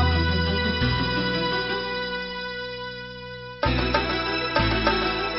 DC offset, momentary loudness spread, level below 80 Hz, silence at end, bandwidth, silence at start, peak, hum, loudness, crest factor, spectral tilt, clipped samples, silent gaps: under 0.1%; 12 LU; -34 dBFS; 0 s; 6 kHz; 0 s; -6 dBFS; none; -24 LUFS; 20 dB; -3 dB/octave; under 0.1%; none